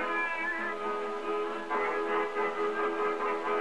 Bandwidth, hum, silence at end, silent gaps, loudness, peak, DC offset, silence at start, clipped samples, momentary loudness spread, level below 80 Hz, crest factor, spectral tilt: 11 kHz; none; 0 s; none; -31 LUFS; -20 dBFS; 0.4%; 0 s; under 0.1%; 3 LU; -68 dBFS; 12 dB; -4 dB/octave